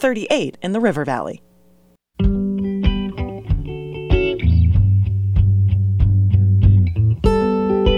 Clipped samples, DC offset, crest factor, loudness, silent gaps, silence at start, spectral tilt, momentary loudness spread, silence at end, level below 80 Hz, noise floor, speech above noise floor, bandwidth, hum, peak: under 0.1%; under 0.1%; 14 dB; -18 LUFS; none; 0 s; -8 dB/octave; 9 LU; 0 s; -24 dBFS; -55 dBFS; 35 dB; 7.6 kHz; none; -2 dBFS